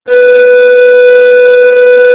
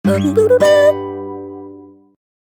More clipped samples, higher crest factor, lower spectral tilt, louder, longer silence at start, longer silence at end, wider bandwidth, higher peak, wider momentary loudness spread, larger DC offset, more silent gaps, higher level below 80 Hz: first, 20% vs under 0.1%; second, 4 dB vs 14 dB; about the same, -5.5 dB/octave vs -6 dB/octave; first, -4 LUFS vs -12 LUFS; about the same, 0.05 s vs 0.05 s; second, 0 s vs 0.7 s; second, 4 kHz vs 19 kHz; about the same, 0 dBFS vs -2 dBFS; second, 1 LU vs 21 LU; neither; neither; first, -54 dBFS vs -60 dBFS